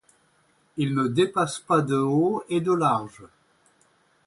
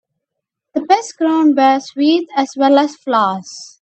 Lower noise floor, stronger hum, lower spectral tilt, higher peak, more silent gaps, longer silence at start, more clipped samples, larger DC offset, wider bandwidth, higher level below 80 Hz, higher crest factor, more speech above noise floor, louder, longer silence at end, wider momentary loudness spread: second, -64 dBFS vs -79 dBFS; neither; first, -6.5 dB/octave vs -4 dB/octave; second, -8 dBFS vs 0 dBFS; neither; about the same, 0.75 s vs 0.75 s; neither; neither; first, 11.5 kHz vs 8.6 kHz; about the same, -66 dBFS vs -70 dBFS; about the same, 18 dB vs 16 dB; second, 41 dB vs 65 dB; second, -24 LUFS vs -15 LUFS; first, 1 s vs 0.15 s; second, 7 LU vs 12 LU